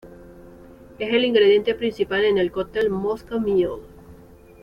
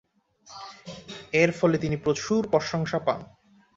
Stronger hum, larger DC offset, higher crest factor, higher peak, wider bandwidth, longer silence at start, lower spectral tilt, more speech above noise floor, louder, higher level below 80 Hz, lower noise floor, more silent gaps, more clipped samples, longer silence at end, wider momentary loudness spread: neither; neither; second, 16 dB vs 22 dB; about the same, -6 dBFS vs -6 dBFS; second, 6.6 kHz vs 8 kHz; second, 0.05 s vs 0.5 s; about the same, -6.5 dB/octave vs -5.5 dB/octave; second, 26 dB vs 31 dB; first, -21 LUFS vs -25 LUFS; first, -50 dBFS vs -56 dBFS; second, -46 dBFS vs -55 dBFS; neither; neither; about the same, 0.5 s vs 0.5 s; second, 10 LU vs 20 LU